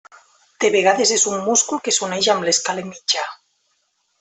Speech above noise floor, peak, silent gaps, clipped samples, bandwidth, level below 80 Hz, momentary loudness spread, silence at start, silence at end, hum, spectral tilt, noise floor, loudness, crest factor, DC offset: 49 dB; -2 dBFS; none; under 0.1%; 8.6 kHz; -68 dBFS; 7 LU; 0.6 s; 0.85 s; none; -1.5 dB/octave; -67 dBFS; -18 LUFS; 18 dB; under 0.1%